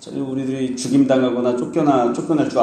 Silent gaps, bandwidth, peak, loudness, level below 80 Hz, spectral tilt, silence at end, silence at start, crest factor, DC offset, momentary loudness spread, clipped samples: none; 11 kHz; -2 dBFS; -19 LUFS; -60 dBFS; -6 dB/octave; 0 s; 0 s; 16 dB; under 0.1%; 8 LU; under 0.1%